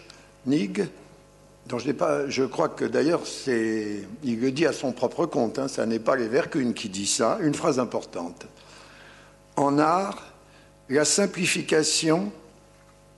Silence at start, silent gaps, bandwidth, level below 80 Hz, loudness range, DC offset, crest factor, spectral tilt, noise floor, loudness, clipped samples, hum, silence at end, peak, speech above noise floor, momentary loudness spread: 0 s; none; 12 kHz; -62 dBFS; 3 LU; under 0.1%; 20 dB; -4 dB/octave; -54 dBFS; -25 LUFS; under 0.1%; 50 Hz at -55 dBFS; 0.7 s; -6 dBFS; 29 dB; 12 LU